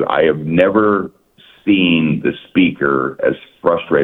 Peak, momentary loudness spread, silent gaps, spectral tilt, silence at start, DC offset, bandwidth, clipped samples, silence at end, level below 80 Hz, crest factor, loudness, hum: 0 dBFS; 7 LU; none; -8.5 dB/octave; 0 s; under 0.1%; 4.1 kHz; under 0.1%; 0 s; -50 dBFS; 16 dB; -15 LUFS; none